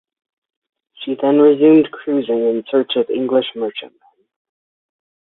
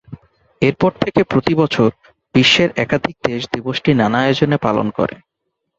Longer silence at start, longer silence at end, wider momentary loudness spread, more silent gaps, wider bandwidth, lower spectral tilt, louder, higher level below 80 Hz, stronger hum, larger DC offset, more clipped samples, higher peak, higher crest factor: first, 1 s vs 0.1 s; first, 1.35 s vs 0.65 s; first, 14 LU vs 9 LU; neither; second, 4.1 kHz vs 8 kHz; first, -10 dB/octave vs -6 dB/octave; about the same, -16 LUFS vs -16 LUFS; second, -66 dBFS vs -48 dBFS; neither; neither; neither; about the same, -2 dBFS vs 0 dBFS; about the same, 16 dB vs 16 dB